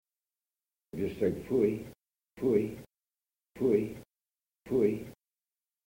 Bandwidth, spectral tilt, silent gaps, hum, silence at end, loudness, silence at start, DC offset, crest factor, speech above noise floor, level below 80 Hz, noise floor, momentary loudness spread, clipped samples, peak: 16.5 kHz; -8.5 dB/octave; none; none; 0.75 s; -31 LUFS; 0.95 s; under 0.1%; 18 dB; over 60 dB; -62 dBFS; under -90 dBFS; 19 LU; under 0.1%; -16 dBFS